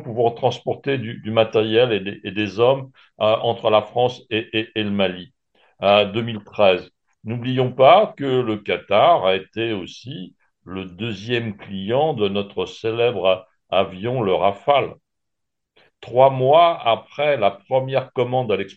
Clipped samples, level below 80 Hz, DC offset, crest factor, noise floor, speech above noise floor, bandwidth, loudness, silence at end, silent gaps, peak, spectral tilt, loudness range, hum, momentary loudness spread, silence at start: under 0.1%; -62 dBFS; under 0.1%; 18 dB; -83 dBFS; 63 dB; 7.6 kHz; -19 LUFS; 0.05 s; none; -2 dBFS; -7 dB/octave; 5 LU; none; 13 LU; 0 s